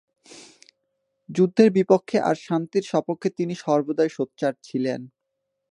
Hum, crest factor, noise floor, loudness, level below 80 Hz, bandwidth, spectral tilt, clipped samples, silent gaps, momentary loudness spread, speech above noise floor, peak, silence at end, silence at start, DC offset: none; 22 dB; -79 dBFS; -23 LUFS; -74 dBFS; 11 kHz; -7 dB/octave; under 0.1%; none; 10 LU; 57 dB; -2 dBFS; 0.65 s; 0.35 s; under 0.1%